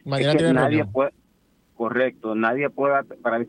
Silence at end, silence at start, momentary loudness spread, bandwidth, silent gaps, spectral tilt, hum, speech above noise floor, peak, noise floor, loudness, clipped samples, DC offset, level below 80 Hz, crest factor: 0 s; 0.05 s; 8 LU; 10.5 kHz; none; -6.5 dB/octave; none; 41 dB; -6 dBFS; -62 dBFS; -22 LUFS; under 0.1%; under 0.1%; -58 dBFS; 16 dB